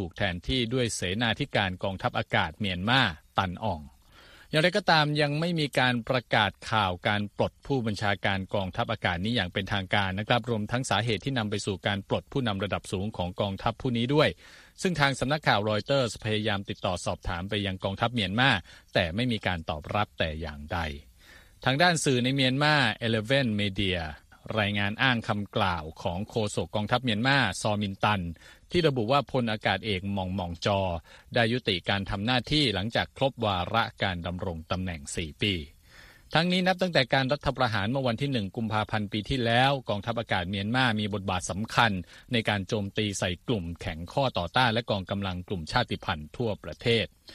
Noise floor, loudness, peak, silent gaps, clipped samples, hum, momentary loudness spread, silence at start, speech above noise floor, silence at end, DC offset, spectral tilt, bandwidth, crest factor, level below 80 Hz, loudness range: -54 dBFS; -28 LUFS; -6 dBFS; none; under 0.1%; none; 9 LU; 0 s; 26 dB; 0 s; under 0.1%; -5 dB/octave; 13.5 kHz; 22 dB; -50 dBFS; 3 LU